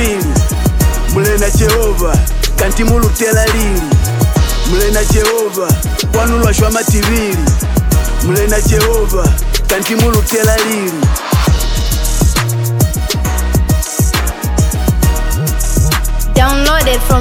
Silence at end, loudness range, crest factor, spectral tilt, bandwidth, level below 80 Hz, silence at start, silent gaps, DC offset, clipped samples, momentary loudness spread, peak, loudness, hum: 0 s; 2 LU; 10 dB; -4.5 dB/octave; 18.5 kHz; -14 dBFS; 0 s; none; under 0.1%; under 0.1%; 4 LU; 0 dBFS; -12 LUFS; none